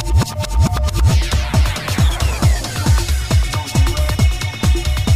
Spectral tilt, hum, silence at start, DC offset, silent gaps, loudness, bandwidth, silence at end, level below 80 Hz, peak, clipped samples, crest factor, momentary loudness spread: -5 dB/octave; none; 0 s; under 0.1%; none; -17 LUFS; 15.5 kHz; 0 s; -18 dBFS; -2 dBFS; under 0.1%; 12 dB; 2 LU